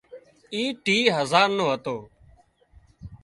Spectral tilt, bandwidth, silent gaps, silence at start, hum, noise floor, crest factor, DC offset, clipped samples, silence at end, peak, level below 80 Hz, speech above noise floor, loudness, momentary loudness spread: -4 dB/octave; 11.5 kHz; none; 0.1 s; none; -57 dBFS; 22 dB; under 0.1%; under 0.1%; 0.1 s; -4 dBFS; -58 dBFS; 34 dB; -23 LUFS; 14 LU